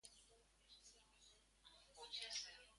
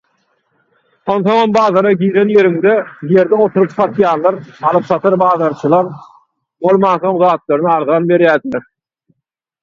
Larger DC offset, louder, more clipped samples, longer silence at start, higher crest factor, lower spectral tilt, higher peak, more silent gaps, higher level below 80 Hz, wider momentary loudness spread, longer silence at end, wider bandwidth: neither; second, -51 LUFS vs -12 LUFS; neither; second, 0.05 s vs 1.05 s; first, 24 dB vs 14 dB; second, 1.5 dB/octave vs -8 dB/octave; second, -36 dBFS vs 0 dBFS; neither; second, -80 dBFS vs -58 dBFS; first, 21 LU vs 6 LU; second, 0 s vs 1.05 s; first, 11.5 kHz vs 7.2 kHz